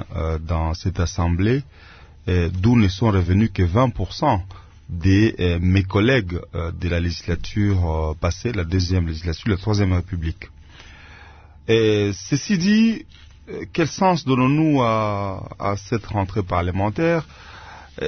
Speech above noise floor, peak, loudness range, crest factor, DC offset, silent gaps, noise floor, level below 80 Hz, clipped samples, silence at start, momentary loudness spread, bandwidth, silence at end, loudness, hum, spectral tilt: 25 dB; -4 dBFS; 4 LU; 16 dB; under 0.1%; none; -44 dBFS; -38 dBFS; under 0.1%; 0 s; 12 LU; 6.6 kHz; 0 s; -21 LUFS; none; -6.5 dB/octave